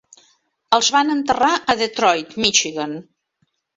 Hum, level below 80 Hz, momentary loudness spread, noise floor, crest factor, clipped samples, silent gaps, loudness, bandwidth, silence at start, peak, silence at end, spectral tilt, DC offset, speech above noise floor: none; -58 dBFS; 10 LU; -69 dBFS; 20 dB; under 0.1%; none; -17 LUFS; 8 kHz; 0.7 s; 0 dBFS; 0.75 s; -1.5 dB/octave; under 0.1%; 50 dB